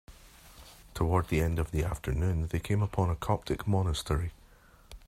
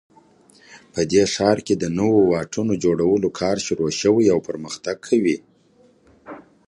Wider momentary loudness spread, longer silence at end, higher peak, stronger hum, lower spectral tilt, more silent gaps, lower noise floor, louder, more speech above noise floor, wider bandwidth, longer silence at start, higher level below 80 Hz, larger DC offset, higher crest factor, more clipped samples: about the same, 12 LU vs 12 LU; second, 0.1 s vs 0.25 s; second, -12 dBFS vs -2 dBFS; neither; first, -6.5 dB/octave vs -5 dB/octave; neither; about the same, -57 dBFS vs -56 dBFS; second, -31 LUFS vs -20 LUFS; second, 28 dB vs 36 dB; first, 15.5 kHz vs 11.5 kHz; second, 0.1 s vs 0.7 s; first, -42 dBFS vs -52 dBFS; neither; about the same, 20 dB vs 18 dB; neither